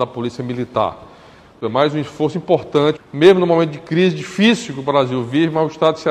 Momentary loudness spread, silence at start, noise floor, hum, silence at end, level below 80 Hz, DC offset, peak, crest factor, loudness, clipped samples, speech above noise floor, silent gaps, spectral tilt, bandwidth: 9 LU; 0 s; -43 dBFS; none; 0 s; -56 dBFS; under 0.1%; 0 dBFS; 16 dB; -17 LUFS; under 0.1%; 27 dB; none; -6.5 dB/octave; 10.5 kHz